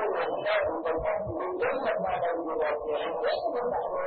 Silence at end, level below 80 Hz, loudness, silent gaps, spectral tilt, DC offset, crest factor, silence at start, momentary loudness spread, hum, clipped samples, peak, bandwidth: 0 s; -56 dBFS; -29 LUFS; none; -9 dB/octave; under 0.1%; 14 dB; 0 s; 3 LU; none; under 0.1%; -14 dBFS; 4.7 kHz